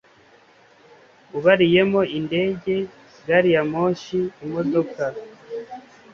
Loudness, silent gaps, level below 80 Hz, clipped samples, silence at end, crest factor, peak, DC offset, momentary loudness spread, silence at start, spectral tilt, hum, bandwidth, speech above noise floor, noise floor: -21 LUFS; none; -60 dBFS; under 0.1%; 0.35 s; 20 dB; -2 dBFS; under 0.1%; 18 LU; 1.35 s; -7 dB/octave; none; 7 kHz; 33 dB; -53 dBFS